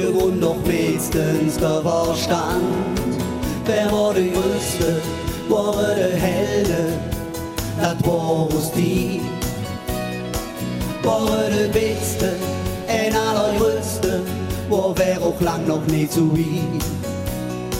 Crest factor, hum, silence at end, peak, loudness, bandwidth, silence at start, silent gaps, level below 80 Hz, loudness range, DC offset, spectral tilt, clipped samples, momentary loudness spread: 16 dB; none; 0 s; -4 dBFS; -21 LUFS; 17 kHz; 0 s; none; -36 dBFS; 2 LU; under 0.1%; -5.5 dB/octave; under 0.1%; 7 LU